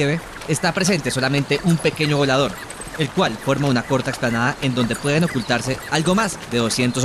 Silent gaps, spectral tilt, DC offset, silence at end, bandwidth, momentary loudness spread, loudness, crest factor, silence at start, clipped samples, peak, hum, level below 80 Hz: none; -4.5 dB/octave; under 0.1%; 0 s; 14.5 kHz; 5 LU; -20 LUFS; 14 dB; 0 s; under 0.1%; -6 dBFS; none; -44 dBFS